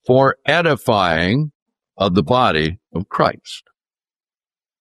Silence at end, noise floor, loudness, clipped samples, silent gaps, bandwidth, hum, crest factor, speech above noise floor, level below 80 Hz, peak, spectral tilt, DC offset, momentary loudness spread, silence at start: 1.2 s; under -90 dBFS; -17 LUFS; under 0.1%; 1.55-1.66 s; 13.5 kHz; none; 18 dB; over 73 dB; -48 dBFS; -2 dBFS; -6.5 dB/octave; under 0.1%; 13 LU; 0.1 s